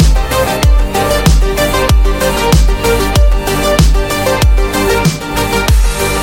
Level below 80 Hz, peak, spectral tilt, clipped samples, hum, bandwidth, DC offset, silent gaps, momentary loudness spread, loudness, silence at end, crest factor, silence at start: -12 dBFS; 0 dBFS; -4.5 dB/octave; under 0.1%; none; 17 kHz; 0.8%; none; 3 LU; -12 LUFS; 0 s; 10 dB; 0 s